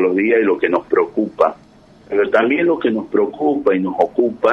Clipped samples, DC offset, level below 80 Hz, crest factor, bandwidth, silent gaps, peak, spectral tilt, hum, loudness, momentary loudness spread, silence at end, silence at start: under 0.1%; under 0.1%; -56 dBFS; 14 dB; 6.6 kHz; none; -2 dBFS; -7.5 dB/octave; none; -17 LUFS; 4 LU; 0 s; 0 s